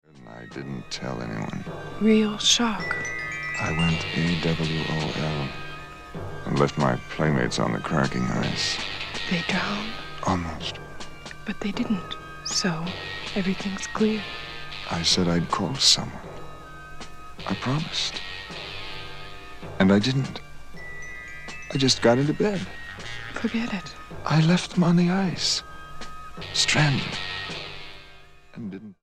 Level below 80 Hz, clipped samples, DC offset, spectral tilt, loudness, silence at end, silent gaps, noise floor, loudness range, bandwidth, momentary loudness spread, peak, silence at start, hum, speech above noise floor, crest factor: -46 dBFS; under 0.1%; under 0.1%; -4 dB/octave; -25 LUFS; 0.1 s; none; -47 dBFS; 5 LU; 13.5 kHz; 19 LU; -4 dBFS; 0.15 s; none; 23 dB; 22 dB